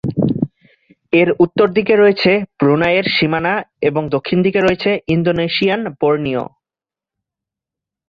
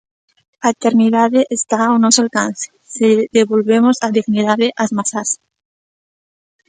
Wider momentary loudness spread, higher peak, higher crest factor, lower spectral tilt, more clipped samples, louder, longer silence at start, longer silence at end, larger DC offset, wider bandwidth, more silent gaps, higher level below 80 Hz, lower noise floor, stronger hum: about the same, 7 LU vs 8 LU; about the same, 0 dBFS vs 0 dBFS; about the same, 16 dB vs 16 dB; first, -8 dB/octave vs -3.5 dB/octave; neither; about the same, -15 LUFS vs -14 LUFS; second, 0.05 s vs 0.6 s; first, 1.65 s vs 1.35 s; neither; second, 7 kHz vs 9.6 kHz; neither; first, -48 dBFS vs -64 dBFS; about the same, -89 dBFS vs under -90 dBFS; neither